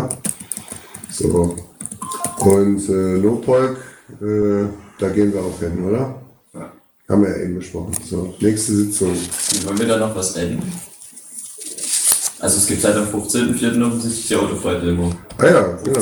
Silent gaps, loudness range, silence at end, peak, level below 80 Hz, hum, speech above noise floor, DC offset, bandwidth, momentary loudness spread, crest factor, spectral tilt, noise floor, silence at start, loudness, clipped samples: none; 4 LU; 0 s; 0 dBFS; -44 dBFS; none; 21 dB; under 0.1%; over 20 kHz; 16 LU; 18 dB; -4.5 dB/octave; -38 dBFS; 0 s; -18 LUFS; under 0.1%